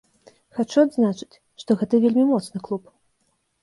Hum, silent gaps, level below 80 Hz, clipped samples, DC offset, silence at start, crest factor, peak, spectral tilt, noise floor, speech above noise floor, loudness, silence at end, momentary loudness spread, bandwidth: none; none; -66 dBFS; under 0.1%; under 0.1%; 0.55 s; 16 dB; -6 dBFS; -7 dB/octave; -70 dBFS; 49 dB; -21 LUFS; 0.85 s; 16 LU; 11.5 kHz